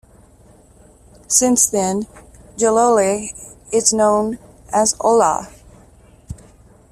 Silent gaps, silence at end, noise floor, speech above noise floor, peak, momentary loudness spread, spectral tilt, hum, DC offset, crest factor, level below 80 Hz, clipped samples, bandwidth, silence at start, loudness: none; 0.55 s; -48 dBFS; 32 dB; 0 dBFS; 23 LU; -3 dB/octave; none; under 0.1%; 18 dB; -48 dBFS; under 0.1%; 15.5 kHz; 1.3 s; -16 LUFS